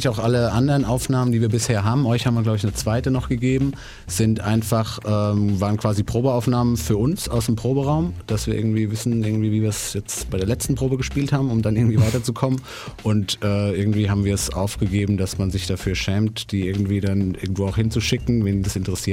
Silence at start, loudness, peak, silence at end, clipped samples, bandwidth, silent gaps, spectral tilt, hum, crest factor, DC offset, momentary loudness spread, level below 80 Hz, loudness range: 0 s; -21 LUFS; -4 dBFS; 0 s; under 0.1%; 16 kHz; none; -6 dB/octave; none; 16 dB; under 0.1%; 5 LU; -38 dBFS; 2 LU